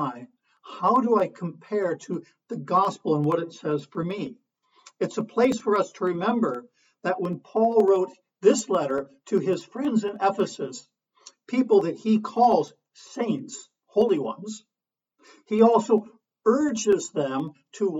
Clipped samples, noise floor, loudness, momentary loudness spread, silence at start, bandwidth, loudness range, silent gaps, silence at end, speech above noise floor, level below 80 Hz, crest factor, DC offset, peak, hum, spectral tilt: under 0.1%; -88 dBFS; -24 LUFS; 15 LU; 0 s; 9.2 kHz; 3 LU; none; 0 s; 64 dB; -70 dBFS; 20 dB; under 0.1%; -4 dBFS; none; -6 dB/octave